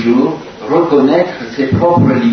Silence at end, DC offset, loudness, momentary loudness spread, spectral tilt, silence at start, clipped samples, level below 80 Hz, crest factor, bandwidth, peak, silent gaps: 0 s; under 0.1%; -12 LUFS; 8 LU; -8.5 dB/octave; 0 s; under 0.1%; -42 dBFS; 12 dB; 6.4 kHz; 0 dBFS; none